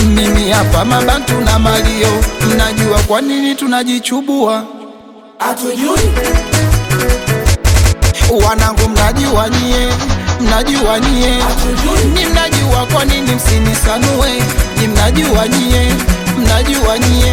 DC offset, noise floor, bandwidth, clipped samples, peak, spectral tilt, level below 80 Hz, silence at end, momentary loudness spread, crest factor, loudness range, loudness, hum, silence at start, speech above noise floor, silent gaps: under 0.1%; -35 dBFS; 17.5 kHz; under 0.1%; 0 dBFS; -4.5 dB/octave; -16 dBFS; 0 s; 4 LU; 10 dB; 3 LU; -12 LUFS; none; 0 s; 24 dB; none